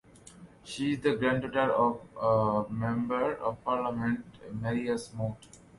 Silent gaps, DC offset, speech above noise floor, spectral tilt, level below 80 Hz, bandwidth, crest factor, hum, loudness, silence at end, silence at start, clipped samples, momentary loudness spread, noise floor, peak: none; under 0.1%; 23 dB; -6.5 dB/octave; -58 dBFS; 11.5 kHz; 18 dB; none; -30 LUFS; 0.2 s; 0.35 s; under 0.1%; 10 LU; -53 dBFS; -12 dBFS